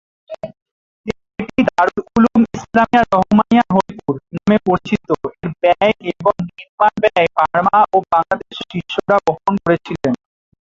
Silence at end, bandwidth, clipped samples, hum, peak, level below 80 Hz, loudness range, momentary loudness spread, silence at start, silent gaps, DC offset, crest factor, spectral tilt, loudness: 0.45 s; 7.6 kHz; under 0.1%; none; 0 dBFS; -46 dBFS; 2 LU; 13 LU; 0.3 s; 0.62-1.04 s, 6.69-6.78 s; under 0.1%; 16 dB; -7 dB/octave; -16 LUFS